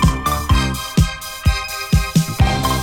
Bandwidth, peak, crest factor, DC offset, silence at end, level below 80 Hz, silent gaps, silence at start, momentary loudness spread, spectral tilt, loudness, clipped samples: 18 kHz; 0 dBFS; 16 dB; under 0.1%; 0 s; -22 dBFS; none; 0 s; 4 LU; -5 dB/octave; -18 LUFS; under 0.1%